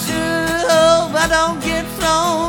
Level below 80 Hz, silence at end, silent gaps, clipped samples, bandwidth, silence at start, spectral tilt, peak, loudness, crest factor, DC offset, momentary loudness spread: -36 dBFS; 0 s; none; under 0.1%; over 20 kHz; 0 s; -3.5 dB/octave; -2 dBFS; -15 LUFS; 14 dB; under 0.1%; 7 LU